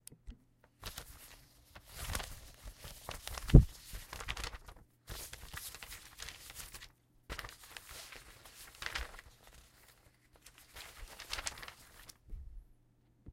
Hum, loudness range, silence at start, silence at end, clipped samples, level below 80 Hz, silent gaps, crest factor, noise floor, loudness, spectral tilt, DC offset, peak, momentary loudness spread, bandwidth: none; 14 LU; 0.25 s; 0 s; under 0.1%; -42 dBFS; none; 34 dB; -69 dBFS; -38 LUFS; -5 dB/octave; under 0.1%; -4 dBFS; 18 LU; 16.5 kHz